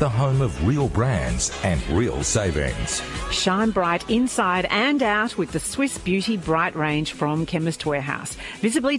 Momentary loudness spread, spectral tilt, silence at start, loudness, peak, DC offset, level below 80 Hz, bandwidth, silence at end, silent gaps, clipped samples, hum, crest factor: 5 LU; -4.5 dB/octave; 0 s; -22 LUFS; -6 dBFS; under 0.1%; -36 dBFS; 11.5 kHz; 0 s; none; under 0.1%; none; 16 dB